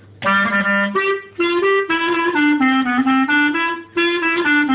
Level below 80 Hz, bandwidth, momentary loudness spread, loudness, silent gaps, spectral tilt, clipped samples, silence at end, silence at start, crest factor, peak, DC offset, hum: -56 dBFS; 4 kHz; 4 LU; -16 LUFS; none; -8 dB/octave; under 0.1%; 0 s; 0.2 s; 10 dB; -6 dBFS; under 0.1%; none